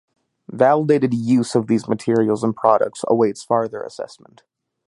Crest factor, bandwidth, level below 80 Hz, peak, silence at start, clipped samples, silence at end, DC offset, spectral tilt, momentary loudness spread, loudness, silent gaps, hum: 18 dB; 11.5 kHz; -64 dBFS; 0 dBFS; 0.5 s; under 0.1%; 0.75 s; under 0.1%; -7 dB/octave; 14 LU; -18 LUFS; none; none